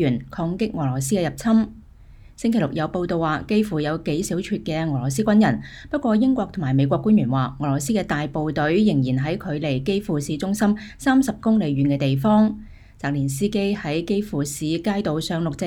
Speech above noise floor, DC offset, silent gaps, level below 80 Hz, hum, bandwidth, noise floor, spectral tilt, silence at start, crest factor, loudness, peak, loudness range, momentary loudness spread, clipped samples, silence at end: 24 dB; under 0.1%; none; -46 dBFS; none; 16 kHz; -45 dBFS; -6.5 dB/octave; 0 s; 16 dB; -22 LUFS; -6 dBFS; 3 LU; 7 LU; under 0.1%; 0 s